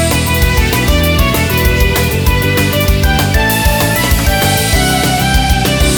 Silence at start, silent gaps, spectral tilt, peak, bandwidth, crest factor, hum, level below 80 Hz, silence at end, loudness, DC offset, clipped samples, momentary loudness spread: 0 s; none; -4 dB/octave; 0 dBFS; over 20 kHz; 10 dB; none; -16 dBFS; 0 s; -11 LUFS; under 0.1%; under 0.1%; 1 LU